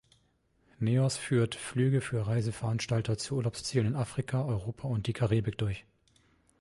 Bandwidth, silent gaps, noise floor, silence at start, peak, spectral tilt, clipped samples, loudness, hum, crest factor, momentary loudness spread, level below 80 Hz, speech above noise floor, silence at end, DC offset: 11.5 kHz; none; -71 dBFS; 0.8 s; -14 dBFS; -6 dB/octave; under 0.1%; -31 LUFS; none; 16 dB; 6 LU; -56 dBFS; 40 dB; 0.8 s; under 0.1%